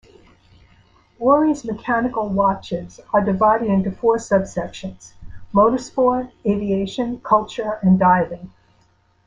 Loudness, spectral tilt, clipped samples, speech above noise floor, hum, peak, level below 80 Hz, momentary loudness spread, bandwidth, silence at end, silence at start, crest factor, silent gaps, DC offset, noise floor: -19 LUFS; -7 dB/octave; under 0.1%; 40 dB; none; -2 dBFS; -48 dBFS; 11 LU; 9.2 kHz; 0.75 s; 1.2 s; 18 dB; none; under 0.1%; -59 dBFS